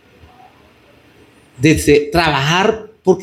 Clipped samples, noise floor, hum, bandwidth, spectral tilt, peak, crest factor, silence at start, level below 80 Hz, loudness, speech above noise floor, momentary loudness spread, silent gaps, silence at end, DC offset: under 0.1%; -48 dBFS; none; 16 kHz; -5 dB/octave; 0 dBFS; 16 dB; 1.6 s; -38 dBFS; -14 LUFS; 35 dB; 5 LU; none; 0 s; under 0.1%